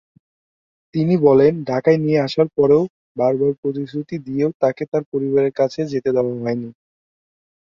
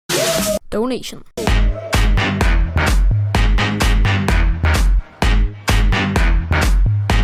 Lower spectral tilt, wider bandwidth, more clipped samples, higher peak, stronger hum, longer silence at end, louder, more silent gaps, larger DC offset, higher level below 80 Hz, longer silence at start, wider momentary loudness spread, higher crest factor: first, -8.5 dB/octave vs -5 dB/octave; second, 7.2 kHz vs 15.5 kHz; neither; about the same, -2 dBFS vs -4 dBFS; neither; first, 0.95 s vs 0 s; about the same, -19 LUFS vs -17 LUFS; first, 2.90-3.15 s, 3.58-3.63 s, 4.55-4.60 s, 4.88-4.92 s, 5.06-5.12 s vs none; neither; second, -58 dBFS vs -16 dBFS; first, 0.95 s vs 0.1 s; first, 12 LU vs 4 LU; first, 18 dB vs 10 dB